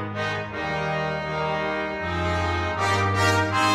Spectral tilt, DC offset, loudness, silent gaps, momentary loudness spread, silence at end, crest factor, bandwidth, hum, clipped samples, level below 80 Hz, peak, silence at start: -5 dB/octave; under 0.1%; -24 LUFS; none; 7 LU; 0 s; 16 dB; 15 kHz; none; under 0.1%; -44 dBFS; -8 dBFS; 0 s